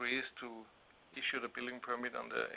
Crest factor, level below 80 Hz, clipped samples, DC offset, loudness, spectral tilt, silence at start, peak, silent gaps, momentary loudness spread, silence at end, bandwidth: 18 dB; -78 dBFS; under 0.1%; under 0.1%; -40 LUFS; 0 dB/octave; 0 s; -24 dBFS; none; 14 LU; 0 s; 4 kHz